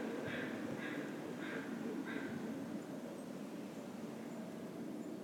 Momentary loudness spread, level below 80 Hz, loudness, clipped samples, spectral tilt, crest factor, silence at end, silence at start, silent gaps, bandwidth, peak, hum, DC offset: 5 LU; -82 dBFS; -45 LUFS; under 0.1%; -5.5 dB/octave; 14 dB; 0 s; 0 s; none; 18.5 kHz; -30 dBFS; none; under 0.1%